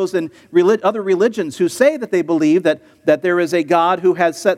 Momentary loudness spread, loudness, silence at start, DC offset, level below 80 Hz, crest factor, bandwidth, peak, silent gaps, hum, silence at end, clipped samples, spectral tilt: 6 LU; -16 LUFS; 0 s; under 0.1%; -68 dBFS; 16 dB; 14.5 kHz; 0 dBFS; none; none; 0 s; under 0.1%; -5.5 dB/octave